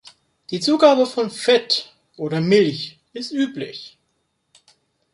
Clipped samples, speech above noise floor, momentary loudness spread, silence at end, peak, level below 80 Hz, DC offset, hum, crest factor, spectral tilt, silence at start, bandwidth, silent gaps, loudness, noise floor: under 0.1%; 52 dB; 17 LU; 1.25 s; -2 dBFS; -68 dBFS; under 0.1%; none; 20 dB; -5 dB/octave; 0.5 s; 11.5 kHz; none; -19 LUFS; -70 dBFS